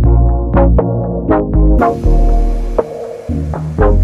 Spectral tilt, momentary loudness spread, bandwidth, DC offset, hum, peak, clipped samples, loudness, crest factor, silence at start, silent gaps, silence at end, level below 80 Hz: -10 dB/octave; 9 LU; 3.4 kHz; under 0.1%; none; 0 dBFS; under 0.1%; -14 LUFS; 10 dB; 0 s; none; 0 s; -14 dBFS